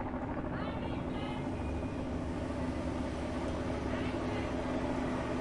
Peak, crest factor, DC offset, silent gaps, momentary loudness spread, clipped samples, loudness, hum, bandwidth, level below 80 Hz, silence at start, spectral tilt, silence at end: -22 dBFS; 14 dB; under 0.1%; none; 2 LU; under 0.1%; -37 LUFS; none; 11.5 kHz; -46 dBFS; 0 s; -7 dB/octave; 0 s